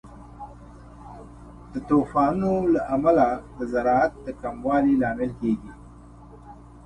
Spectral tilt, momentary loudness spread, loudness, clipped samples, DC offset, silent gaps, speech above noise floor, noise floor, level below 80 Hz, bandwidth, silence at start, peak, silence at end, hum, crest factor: -8.5 dB/octave; 23 LU; -23 LUFS; under 0.1%; under 0.1%; none; 23 dB; -46 dBFS; -46 dBFS; 10 kHz; 0.05 s; -6 dBFS; 0.05 s; none; 18 dB